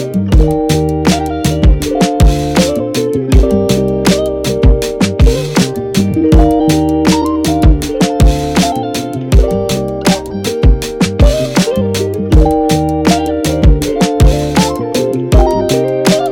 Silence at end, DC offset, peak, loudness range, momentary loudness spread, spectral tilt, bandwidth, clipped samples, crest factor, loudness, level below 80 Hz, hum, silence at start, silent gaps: 0 s; under 0.1%; 0 dBFS; 2 LU; 4 LU; -6 dB/octave; 17 kHz; 0.6%; 10 dB; -12 LUFS; -14 dBFS; none; 0 s; none